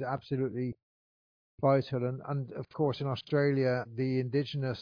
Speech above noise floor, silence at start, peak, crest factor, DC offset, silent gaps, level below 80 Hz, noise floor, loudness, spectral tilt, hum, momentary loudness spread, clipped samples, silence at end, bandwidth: over 59 dB; 0 s; -14 dBFS; 18 dB; under 0.1%; 0.82-1.58 s; -68 dBFS; under -90 dBFS; -32 LUFS; -9 dB/octave; none; 9 LU; under 0.1%; 0 s; 5.2 kHz